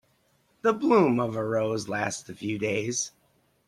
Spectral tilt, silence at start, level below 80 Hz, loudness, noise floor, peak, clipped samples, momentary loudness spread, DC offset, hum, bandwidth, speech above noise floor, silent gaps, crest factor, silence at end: -5 dB/octave; 0.65 s; -68 dBFS; -27 LUFS; -67 dBFS; -8 dBFS; under 0.1%; 11 LU; under 0.1%; none; 14 kHz; 41 dB; none; 20 dB; 0.6 s